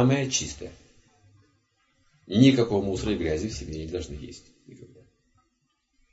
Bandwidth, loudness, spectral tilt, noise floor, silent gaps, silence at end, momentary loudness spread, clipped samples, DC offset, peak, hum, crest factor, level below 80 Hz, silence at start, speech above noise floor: 8 kHz; -25 LUFS; -5.5 dB/octave; -74 dBFS; none; 1.25 s; 22 LU; under 0.1%; under 0.1%; -4 dBFS; none; 22 dB; -48 dBFS; 0 s; 49 dB